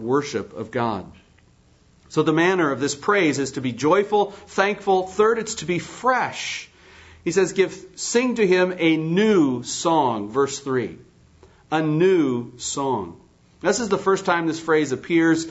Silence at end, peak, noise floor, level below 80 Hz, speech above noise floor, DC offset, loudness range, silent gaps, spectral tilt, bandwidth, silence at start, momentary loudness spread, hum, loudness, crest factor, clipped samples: 0 s; -4 dBFS; -56 dBFS; -60 dBFS; 35 dB; under 0.1%; 3 LU; none; -4.5 dB/octave; 8 kHz; 0 s; 9 LU; none; -21 LUFS; 18 dB; under 0.1%